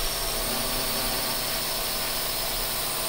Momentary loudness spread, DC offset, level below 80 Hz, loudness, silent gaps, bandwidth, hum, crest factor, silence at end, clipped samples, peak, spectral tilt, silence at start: 1 LU; under 0.1%; -40 dBFS; -25 LUFS; none; 16 kHz; none; 14 dB; 0 s; under 0.1%; -14 dBFS; -1 dB/octave; 0 s